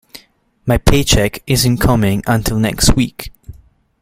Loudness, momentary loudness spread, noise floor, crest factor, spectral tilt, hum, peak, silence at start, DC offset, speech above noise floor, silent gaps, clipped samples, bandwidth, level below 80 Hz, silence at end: -14 LUFS; 9 LU; -51 dBFS; 14 dB; -4.5 dB/octave; none; 0 dBFS; 0.15 s; under 0.1%; 38 dB; none; under 0.1%; 16.5 kHz; -24 dBFS; 0.5 s